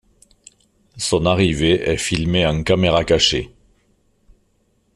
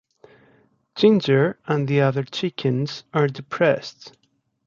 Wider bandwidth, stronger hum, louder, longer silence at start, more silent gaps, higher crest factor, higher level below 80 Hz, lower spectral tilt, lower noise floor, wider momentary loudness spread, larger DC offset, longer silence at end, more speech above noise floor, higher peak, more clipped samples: first, 13.5 kHz vs 7.4 kHz; neither; first, -17 LUFS vs -21 LUFS; about the same, 0.95 s vs 0.95 s; neither; about the same, 18 dB vs 18 dB; first, -38 dBFS vs -66 dBFS; second, -4.5 dB/octave vs -7 dB/octave; first, -63 dBFS vs -59 dBFS; about the same, 7 LU vs 9 LU; neither; first, 1.5 s vs 0.6 s; first, 46 dB vs 39 dB; about the same, -2 dBFS vs -4 dBFS; neither